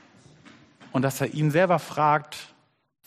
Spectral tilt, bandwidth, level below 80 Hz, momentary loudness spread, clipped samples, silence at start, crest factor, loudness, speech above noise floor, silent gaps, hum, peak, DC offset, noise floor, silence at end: -6 dB/octave; 15 kHz; -68 dBFS; 12 LU; under 0.1%; 0.95 s; 18 dB; -24 LUFS; 29 dB; none; none; -8 dBFS; under 0.1%; -53 dBFS; 0.6 s